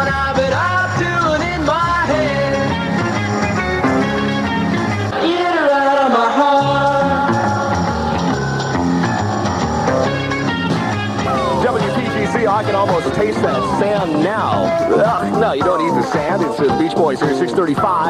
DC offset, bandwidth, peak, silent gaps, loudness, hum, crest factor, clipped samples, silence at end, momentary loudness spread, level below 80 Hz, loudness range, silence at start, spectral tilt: under 0.1%; 13.5 kHz; -4 dBFS; none; -16 LUFS; none; 12 dB; under 0.1%; 0 s; 4 LU; -38 dBFS; 3 LU; 0 s; -6 dB/octave